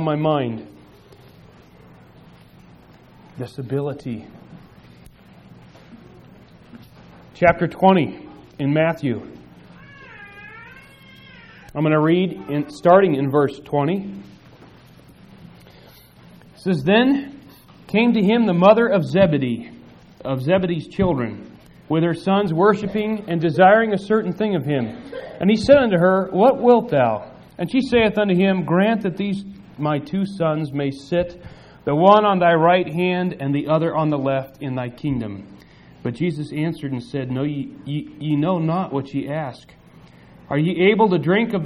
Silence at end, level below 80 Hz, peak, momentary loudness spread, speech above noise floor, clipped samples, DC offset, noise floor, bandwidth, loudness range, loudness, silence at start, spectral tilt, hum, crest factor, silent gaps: 0 s; -50 dBFS; 0 dBFS; 17 LU; 29 dB; under 0.1%; under 0.1%; -47 dBFS; 11.5 kHz; 12 LU; -19 LUFS; 0 s; -8 dB/octave; none; 20 dB; none